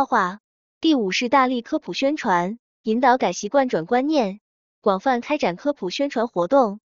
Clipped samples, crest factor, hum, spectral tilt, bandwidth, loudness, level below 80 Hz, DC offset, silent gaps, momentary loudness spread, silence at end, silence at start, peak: under 0.1%; 18 dB; none; -4.5 dB/octave; 7.6 kHz; -21 LUFS; -66 dBFS; under 0.1%; 0.40-0.81 s, 2.59-2.84 s, 4.41-4.82 s; 8 LU; 0.1 s; 0 s; -4 dBFS